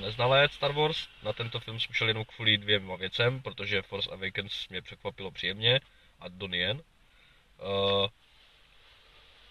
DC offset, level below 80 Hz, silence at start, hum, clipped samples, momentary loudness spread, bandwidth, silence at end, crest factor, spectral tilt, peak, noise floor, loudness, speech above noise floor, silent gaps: under 0.1%; -60 dBFS; 0 s; none; under 0.1%; 14 LU; 13 kHz; 1.4 s; 22 dB; -5.5 dB/octave; -10 dBFS; -61 dBFS; -29 LUFS; 30 dB; none